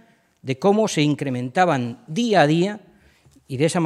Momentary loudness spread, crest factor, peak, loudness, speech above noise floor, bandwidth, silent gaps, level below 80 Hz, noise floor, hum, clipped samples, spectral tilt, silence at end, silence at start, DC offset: 13 LU; 20 dB; -2 dBFS; -20 LUFS; 35 dB; 13.5 kHz; none; -66 dBFS; -55 dBFS; none; under 0.1%; -5.5 dB/octave; 0 s; 0.45 s; under 0.1%